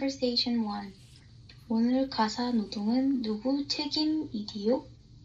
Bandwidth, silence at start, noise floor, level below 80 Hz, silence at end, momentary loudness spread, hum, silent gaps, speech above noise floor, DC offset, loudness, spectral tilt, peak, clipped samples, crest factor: 7.8 kHz; 0 s; -52 dBFS; -60 dBFS; 0.05 s; 6 LU; none; none; 23 dB; under 0.1%; -30 LUFS; -5 dB/octave; -14 dBFS; under 0.1%; 16 dB